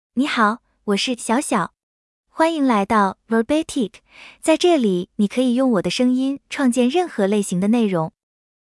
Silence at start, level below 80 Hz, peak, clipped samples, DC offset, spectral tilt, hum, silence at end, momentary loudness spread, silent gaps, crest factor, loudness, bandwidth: 0.15 s; -58 dBFS; -4 dBFS; under 0.1%; under 0.1%; -5 dB/octave; none; 0.55 s; 7 LU; 1.83-2.24 s; 16 dB; -19 LUFS; 12 kHz